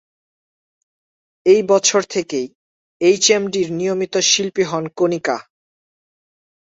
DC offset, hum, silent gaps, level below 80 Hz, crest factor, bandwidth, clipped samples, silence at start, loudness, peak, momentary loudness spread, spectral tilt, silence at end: under 0.1%; none; 2.55-3.00 s; -64 dBFS; 18 dB; 8 kHz; under 0.1%; 1.45 s; -17 LUFS; -2 dBFS; 10 LU; -3 dB/octave; 1.3 s